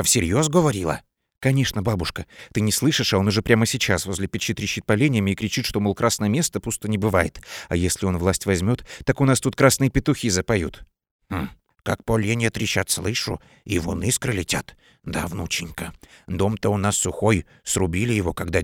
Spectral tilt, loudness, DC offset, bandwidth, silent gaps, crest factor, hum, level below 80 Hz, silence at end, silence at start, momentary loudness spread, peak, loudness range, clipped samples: -4.5 dB/octave; -22 LUFS; under 0.1%; 18.5 kHz; 11.11-11.19 s; 22 dB; none; -42 dBFS; 0 s; 0 s; 11 LU; 0 dBFS; 4 LU; under 0.1%